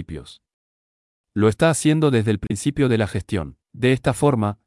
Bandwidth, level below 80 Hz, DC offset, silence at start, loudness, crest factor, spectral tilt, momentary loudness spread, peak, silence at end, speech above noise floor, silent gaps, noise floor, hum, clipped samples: 12 kHz; -46 dBFS; under 0.1%; 0 s; -20 LUFS; 16 dB; -6 dB/octave; 12 LU; -6 dBFS; 0.15 s; over 70 dB; 0.54-1.24 s; under -90 dBFS; none; under 0.1%